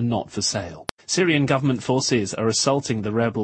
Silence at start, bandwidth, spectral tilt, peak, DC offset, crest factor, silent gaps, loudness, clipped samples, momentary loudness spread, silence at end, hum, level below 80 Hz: 0 s; 10.5 kHz; -4.5 dB/octave; -2 dBFS; under 0.1%; 20 dB; 0.91-0.97 s; -22 LUFS; under 0.1%; 6 LU; 0 s; none; -54 dBFS